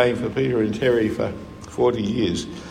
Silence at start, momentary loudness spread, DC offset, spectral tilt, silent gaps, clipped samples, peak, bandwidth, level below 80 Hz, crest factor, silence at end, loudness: 0 s; 9 LU; under 0.1%; -6 dB/octave; none; under 0.1%; -4 dBFS; 10.5 kHz; -48 dBFS; 18 dB; 0 s; -22 LUFS